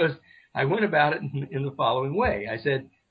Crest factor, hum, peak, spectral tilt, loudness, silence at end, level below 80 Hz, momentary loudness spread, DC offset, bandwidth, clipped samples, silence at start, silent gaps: 16 dB; none; -10 dBFS; -9.5 dB/octave; -26 LUFS; 0.25 s; -50 dBFS; 9 LU; under 0.1%; 5.2 kHz; under 0.1%; 0 s; none